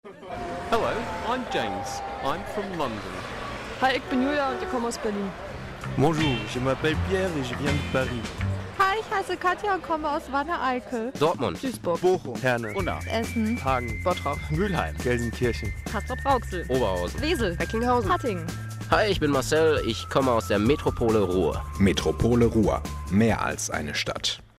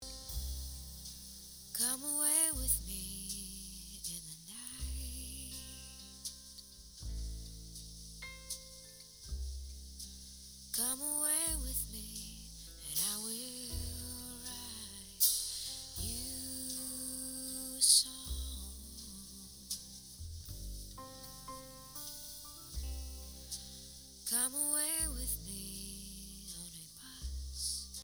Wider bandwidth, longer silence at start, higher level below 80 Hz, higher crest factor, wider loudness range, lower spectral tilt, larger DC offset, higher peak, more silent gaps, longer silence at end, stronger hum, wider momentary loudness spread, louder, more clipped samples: second, 16 kHz vs over 20 kHz; about the same, 0.05 s vs 0 s; first, -40 dBFS vs -50 dBFS; second, 20 dB vs 28 dB; second, 5 LU vs 13 LU; first, -5.5 dB/octave vs -1.5 dB/octave; neither; first, -6 dBFS vs -12 dBFS; neither; first, 0.15 s vs 0 s; neither; second, 9 LU vs 18 LU; first, -26 LUFS vs -37 LUFS; neither